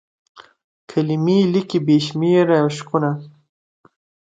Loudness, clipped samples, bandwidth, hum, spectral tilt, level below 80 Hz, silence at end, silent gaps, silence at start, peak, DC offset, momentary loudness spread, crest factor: -18 LUFS; under 0.1%; 9.2 kHz; none; -7 dB/octave; -64 dBFS; 1.05 s; 0.64-0.88 s; 0.35 s; -2 dBFS; under 0.1%; 8 LU; 16 dB